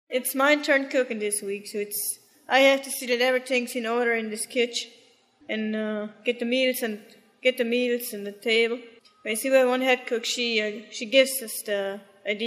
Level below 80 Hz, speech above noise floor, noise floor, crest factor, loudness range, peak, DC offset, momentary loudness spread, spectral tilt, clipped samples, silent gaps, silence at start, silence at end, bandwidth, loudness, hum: under -90 dBFS; 33 dB; -58 dBFS; 22 dB; 4 LU; -4 dBFS; under 0.1%; 11 LU; -2 dB/octave; under 0.1%; none; 0.1 s; 0 s; 15.5 kHz; -25 LUFS; none